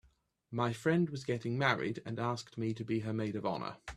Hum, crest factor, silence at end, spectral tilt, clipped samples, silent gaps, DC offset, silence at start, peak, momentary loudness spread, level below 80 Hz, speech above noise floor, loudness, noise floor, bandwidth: none; 22 dB; 0 s; -6.5 dB/octave; under 0.1%; none; under 0.1%; 0.5 s; -12 dBFS; 7 LU; -68 dBFS; 36 dB; -35 LUFS; -71 dBFS; 13 kHz